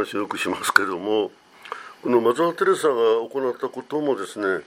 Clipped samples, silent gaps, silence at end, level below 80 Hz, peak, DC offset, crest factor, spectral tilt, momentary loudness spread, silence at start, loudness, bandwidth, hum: under 0.1%; none; 0.05 s; -72 dBFS; 0 dBFS; under 0.1%; 22 dB; -4 dB/octave; 12 LU; 0 s; -22 LUFS; 16 kHz; none